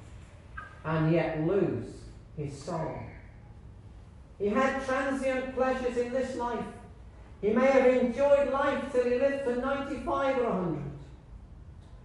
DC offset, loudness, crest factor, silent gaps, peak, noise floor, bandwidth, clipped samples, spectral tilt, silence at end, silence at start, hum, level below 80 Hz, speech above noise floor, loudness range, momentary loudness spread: under 0.1%; -29 LUFS; 18 dB; none; -10 dBFS; -50 dBFS; 11.5 kHz; under 0.1%; -7 dB/octave; 0 s; 0 s; none; -52 dBFS; 22 dB; 7 LU; 21 LU